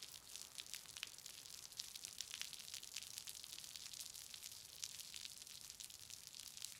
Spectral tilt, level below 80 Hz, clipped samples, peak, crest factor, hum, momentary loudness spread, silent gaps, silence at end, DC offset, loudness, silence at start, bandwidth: 1.5 dB/octave; -82 dBFS; under 0.1%; -20 dBFS; 34 dB; none; 4 LU; none; 0 s; under 0.1%; -51 LUFS; 0 s; 17 kHz